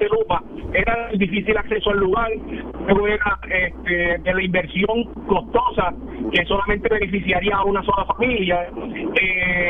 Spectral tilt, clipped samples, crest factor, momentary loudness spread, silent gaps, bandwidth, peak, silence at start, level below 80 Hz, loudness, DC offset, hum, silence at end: -8 dB/octave; under 0.1%; 16 dB; 6 LU; none; 4 kHz; -4 dBFS; 0 s; -34 dBFS; -20 LUFS; under 0.1%; none; 0 s